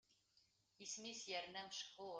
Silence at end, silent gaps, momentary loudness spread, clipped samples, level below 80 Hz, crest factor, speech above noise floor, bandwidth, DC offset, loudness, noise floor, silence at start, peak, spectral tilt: 0 s; none; 4 LU; under 0.1%; under -90 dBFS; 18 dB; 28 dB; 10 kHz; under 0.1%; -50 LUFS; -79 dBFS; 0.1 s; -36 dBFS; -1 dB/octave